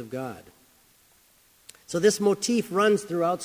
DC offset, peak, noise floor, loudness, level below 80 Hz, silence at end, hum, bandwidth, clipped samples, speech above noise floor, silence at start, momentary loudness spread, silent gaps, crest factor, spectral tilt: under 0.1%; -8 dBFS; -60 dBFS; -24 LUFS; -68 dBFS; 0 s; none; 16 kHz; under 0.1%; 36 dB; 0 s; 14 LU; none; 20 dB; -4.5 dB/octave